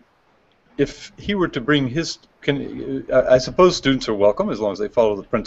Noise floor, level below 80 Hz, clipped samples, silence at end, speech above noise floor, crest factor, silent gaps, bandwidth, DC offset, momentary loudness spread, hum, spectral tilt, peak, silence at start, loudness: -59 dBFS; -44 dBFS; under 0.1%; 0 s; 40 dB; 18 dB; none; 8 kHz; under 0.1%; 11 LU; none; -5.5 dB/octave; -2 dBFS; 0.8 s; -20 LUFS